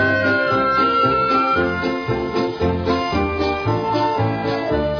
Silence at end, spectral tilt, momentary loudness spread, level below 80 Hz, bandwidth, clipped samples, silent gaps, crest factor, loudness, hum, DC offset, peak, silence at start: 0 s; -7 dB/octave; 6 LU; -38 dBFS; 5.4 kHz; under 0.1%; none; 12 dB; -19 LUFS; none; under 0.1%; -6 dBFS; 0 s